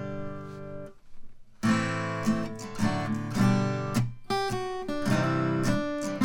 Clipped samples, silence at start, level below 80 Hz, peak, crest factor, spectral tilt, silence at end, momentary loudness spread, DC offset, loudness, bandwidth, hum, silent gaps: under 0.1%; 0 s; -48 dBFS; -12 dBFS; 16 dB; -6 dB/octave; 0 s; 14 LU; under 0.1%; -29 LUFS; 18 kHz; none; none